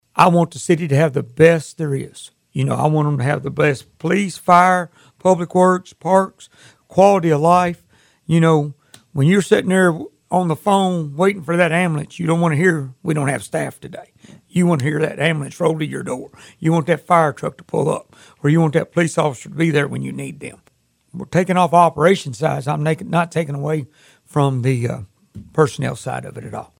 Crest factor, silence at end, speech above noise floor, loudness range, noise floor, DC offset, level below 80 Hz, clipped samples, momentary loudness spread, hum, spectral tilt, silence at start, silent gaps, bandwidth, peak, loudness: 18 dB; 0.15 s; 41 dB; 4 LU; -58 dBFS; under 0.1%; -56 dBFS; under 0.1%; 14 LU; none; -6.5 dB/octave; 0.15 s; none; 15.5 kHz; 0 dBFS; -17 LUFS